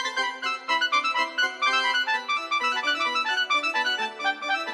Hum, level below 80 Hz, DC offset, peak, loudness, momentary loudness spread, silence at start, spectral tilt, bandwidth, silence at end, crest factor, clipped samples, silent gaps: none; -82 dBFS; under 0.1%; -10 dBFS; -24 LUFS; 5 LU; 0 s; 1 dB/octave; 12.5 kHz; 0 s; 16 dB; under 0.1%; none